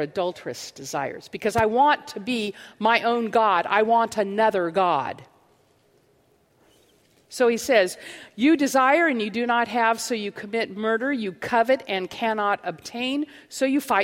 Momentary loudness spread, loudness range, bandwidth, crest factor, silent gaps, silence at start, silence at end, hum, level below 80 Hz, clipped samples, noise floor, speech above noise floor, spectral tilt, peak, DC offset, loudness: 12 LU; 5 LU; 16.5 kHz; 20 dB; none; 0 s; 0 s; none; -62 dBFS; under 0.1%; -62 dBFS; 39 dB; -4 dB/octave; -4 dBFS; under 0.1%; -23 LUFS